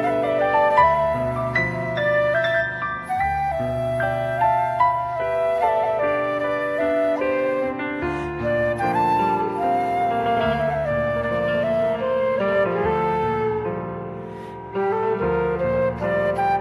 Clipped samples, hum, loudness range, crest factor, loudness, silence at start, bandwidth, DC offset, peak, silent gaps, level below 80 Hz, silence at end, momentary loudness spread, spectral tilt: under 0.1%; none; 3 LU; 16 dB; -21 LUFS; 0 s; 13 kHz; under 0.1%; -4 dBFS; none; -44 dBFS; 0 s; 6 LU; -7 dB/octave